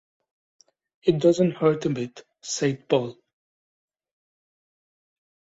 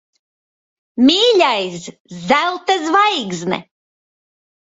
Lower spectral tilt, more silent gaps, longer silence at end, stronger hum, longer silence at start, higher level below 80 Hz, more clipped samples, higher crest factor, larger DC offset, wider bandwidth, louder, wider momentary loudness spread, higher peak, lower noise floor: first, -6 dB/octave vs -3.5 dB/octave; second, none vs 2.00-2.05 s; first, 2.35 s vs 1.05 s; neither; about the same, 1.05 s vs 0.95 s; about the same, -66 dBFS vs -62 dBFS; neither; about the same, 20 dB vs 18 dB; neither; about the same, 8 kHz vs 8 kHz; second, -24 LUFS vs -15 LUFS; second, 14 LU vs 19 LU; second, -6 dBFS vs 0 dBFS; about the same, under -90 dBFS vs under -90 dBFS